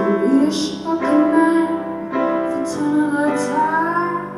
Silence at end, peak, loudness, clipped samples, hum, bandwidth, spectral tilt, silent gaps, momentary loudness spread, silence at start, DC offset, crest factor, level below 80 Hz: 0 s; -2 dBFS; -18 LUFS; under 0.1%; none; 12.5 kHz; -5.5 dB/octave; none; 7 LU; 0 s; under 0.1%; 14 dB; -58 dBFS